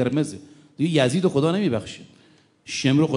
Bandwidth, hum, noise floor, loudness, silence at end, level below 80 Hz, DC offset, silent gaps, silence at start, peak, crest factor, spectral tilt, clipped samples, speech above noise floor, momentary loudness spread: 11 kHz; none; -56 dBFS; -22 LUFS; 0 s; -62 dBFS; under 0.1%; none; 0 s; -4 dBFS; 18 dB; -6 dB/octave; under 0.1%; 35 dB; 17 LU